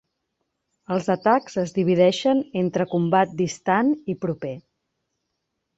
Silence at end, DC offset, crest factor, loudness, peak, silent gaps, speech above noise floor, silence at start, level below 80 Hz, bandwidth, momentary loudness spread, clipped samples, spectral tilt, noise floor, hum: 1.2 s; under 0.1%; 18 dB; -22 LUFS; -4 dBFS; none; 57 dB; 0.9 s; -64 dBFS; 8 kHz; 10 LU; under 0.1%; -6 dB/octave; -78 dBFS; none